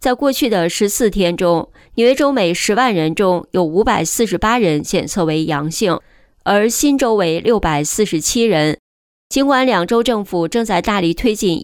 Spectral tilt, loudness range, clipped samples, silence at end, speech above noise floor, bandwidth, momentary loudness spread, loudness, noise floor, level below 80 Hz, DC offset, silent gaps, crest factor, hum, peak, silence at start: -4 dB/octave; 1 LU; under 0.1%; 0 s; over 75 dB; 20 kHz; 5 LU; -15 LUFS; under -90 dBFS; -38 dBFS; under 0.1%; 8.79-9.30 s; 12 dB; none; -2 dBFS; 0 s